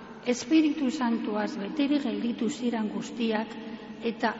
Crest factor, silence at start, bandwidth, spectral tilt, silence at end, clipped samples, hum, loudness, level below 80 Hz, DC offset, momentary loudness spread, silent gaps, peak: 16 dB; 0 s; 8 kHz; -4 dB/octave; 0 s; under 0.1%; none; -29 LUFS; -66 dBFS; under 0.1%; 10 LU; none; -12 dBFS